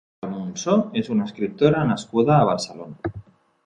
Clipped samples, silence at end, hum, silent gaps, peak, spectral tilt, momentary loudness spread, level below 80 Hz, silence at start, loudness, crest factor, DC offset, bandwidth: under 0.1%; 0.45 s; none; none; -4 dBFS; -6.5 dB/octave; 15 LU; -52 dBFS; 0.25 s; -21 LUFS; 18 dB; under 0.1%; 10.5 kHz